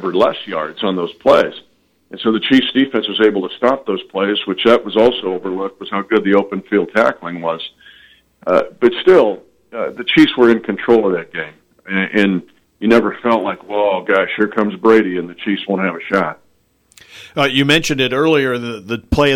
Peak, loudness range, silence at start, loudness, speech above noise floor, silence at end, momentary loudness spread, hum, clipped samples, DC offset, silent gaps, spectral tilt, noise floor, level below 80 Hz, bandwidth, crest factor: -2 dBFS; 3 LU; 0 s; -15 LUFS; 43 dB; 0 s; 11 LU; none; under 0.1%; under 0.1%; none; -5.5 dB/octave; -58 dBFS; -42 dBFS; 15.5 kHz; 14 dB